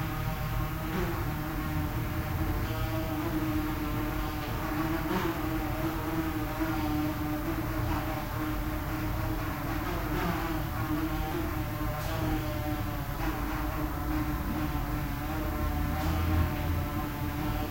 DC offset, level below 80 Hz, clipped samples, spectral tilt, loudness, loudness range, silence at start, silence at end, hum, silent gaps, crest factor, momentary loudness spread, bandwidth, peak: 0.2%; -38 dBFS; under 0.1%; -6.5 dB/octave; -32 LUFS; 1 LU; 0 s; 0 s; none; none; 14 dB; 3 LU; 16.5 kHz; -16 dBFS